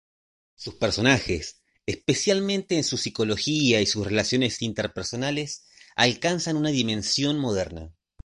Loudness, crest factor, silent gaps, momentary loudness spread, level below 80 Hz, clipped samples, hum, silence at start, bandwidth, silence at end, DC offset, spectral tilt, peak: -24 LUFS; 22 dB; none; 13 LU; -48 dBFS; under 0.1%; none; 0.6 s; 11.5 kHz; 0.35 s; under 0.1%; -4 dB/octave; -4 dBFS